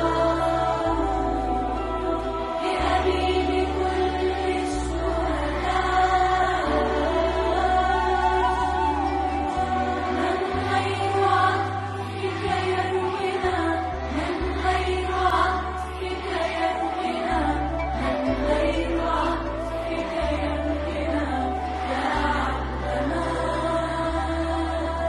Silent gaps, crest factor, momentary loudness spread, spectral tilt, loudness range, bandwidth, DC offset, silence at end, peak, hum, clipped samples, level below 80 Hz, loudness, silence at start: none; 16 dB; 6 LU; -6 dB/octave; 3 LU; 11.5 kHz; under 0.1%; 0 s; -8 dBFS; none; under 0.1%; -34 dBFS; -24 LUFS; 0 s